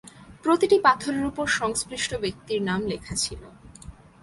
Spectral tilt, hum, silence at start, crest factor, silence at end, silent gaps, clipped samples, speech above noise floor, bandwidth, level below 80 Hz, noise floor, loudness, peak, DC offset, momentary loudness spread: -3.5 dB/octave; none; 0.05 s; 20 dB; 0.3 s; none; under 0.1%; 21 dB; 11.5 kHz; -50 dBFS; -45 dBFS; -24 LUFS; -4 dBFS; under 0.1%; 11 LU